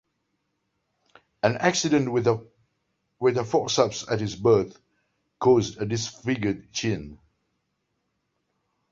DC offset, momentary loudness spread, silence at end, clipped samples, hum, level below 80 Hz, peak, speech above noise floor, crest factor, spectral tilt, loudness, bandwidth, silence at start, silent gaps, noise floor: under 0.1%; 8 LU; 1.75 s; under 0.1%; none; -56 dBFS; -6 dBFS; 53 dB; 22 dB; -5 dB/octave; -24 LUFS; 7.8 kHz; 1.45 s; none; -76 dBFS